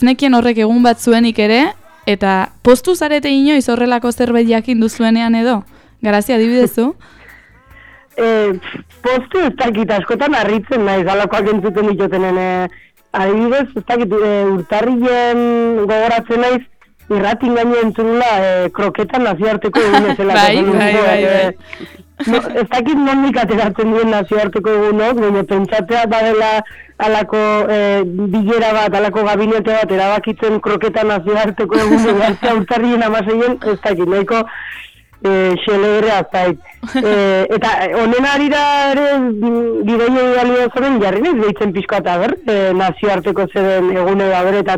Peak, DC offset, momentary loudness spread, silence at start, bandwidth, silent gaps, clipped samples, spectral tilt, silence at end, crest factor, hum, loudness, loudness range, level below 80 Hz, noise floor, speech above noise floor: 0 dBFS; under 0.1%; 6 LU; 0 s; 15 kHz; none; under 0.1%; -5.5 dB/octave; 0 s; 12 dB; none; -14 LUFS; 3 LU; -44 dBFS; -42 dBFS; 29 dB